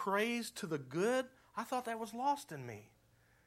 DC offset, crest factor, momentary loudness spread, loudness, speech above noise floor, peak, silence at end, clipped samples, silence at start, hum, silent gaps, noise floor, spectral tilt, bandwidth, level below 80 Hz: under 0.1%; 18 dB; 13 LU; -39 LUFS; 32 dB; -22 dBFS; 0.6 s; under 0.1%; 0 s; none; none; -70 dBFS; -4.5 dB/octave; 16.5 kHz; -80 dBFS